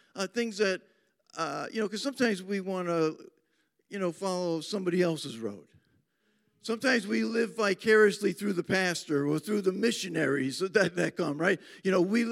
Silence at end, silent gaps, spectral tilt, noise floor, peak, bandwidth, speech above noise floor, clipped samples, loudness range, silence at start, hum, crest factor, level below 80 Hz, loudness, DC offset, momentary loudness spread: 0 s; none; -5 dB/octave; -74 dBFS; -10 dBFS; 16 kHz; 45 dB; under 0.1%; 6 LU; 0.15 s; none; 20 dB; -80 dBFS; -29 LUFS; under 0.1%; 9 LU